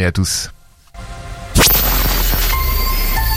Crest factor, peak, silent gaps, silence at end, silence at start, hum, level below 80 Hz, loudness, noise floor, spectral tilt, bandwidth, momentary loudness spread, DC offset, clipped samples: 16 dB; 0 dBFS; none; 0 s; 0 s; none; -20 dBFS; -14 LUFS; -36 dBFS; -3 dB/octave; 17 kHz; 21 LU; under 0.1%; under 0.1%